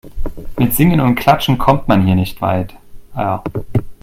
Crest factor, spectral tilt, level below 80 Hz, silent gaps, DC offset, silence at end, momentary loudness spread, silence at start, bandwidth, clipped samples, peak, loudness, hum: 14 dB; -6.5 dB/octave; -30 dBFS; none; under 0.1%; 0.1 s; 16 LU; 0.05 s; 16.5 kHz; under 0.1%; 0 dBFS; -15 LUFS; none